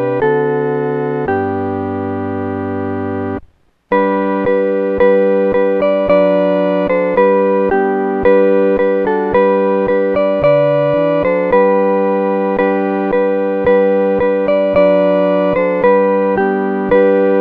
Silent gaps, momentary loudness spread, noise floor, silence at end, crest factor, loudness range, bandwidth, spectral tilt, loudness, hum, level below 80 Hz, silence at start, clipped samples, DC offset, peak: none; 8 LU; -45 dBFS; 0 s; 12 dB; 5 LU; 4.7 kHz; -9.5 dB/octave; -13 LUFS; none; -44 dBFS; 0 s; under 0.1%; under 0.1%; 0 dBFS